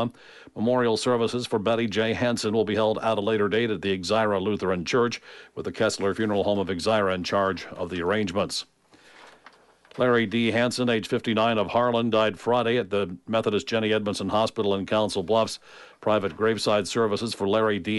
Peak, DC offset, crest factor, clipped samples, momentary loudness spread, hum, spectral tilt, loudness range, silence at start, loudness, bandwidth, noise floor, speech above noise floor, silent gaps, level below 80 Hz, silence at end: -10 dBFS; under 0.1%; 14 dB; under 0.1%; 6 LU; none; -5 dB/octave; 3 LU; 0 s; -25 LUFS; 11.5 kHz; -54 dBFS; 30 dB; none; -60 dBFS; 0 s